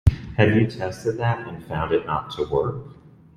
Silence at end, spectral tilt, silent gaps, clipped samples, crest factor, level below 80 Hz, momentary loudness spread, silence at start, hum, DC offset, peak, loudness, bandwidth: 0.3 s; -7.5 dB/octave; none; under 0.1%; 22 dB; -36 dBFS; 11 LU; 0.05 s; none; under 0.1%; -2 dBFS; -23 LUFS; 11 kHz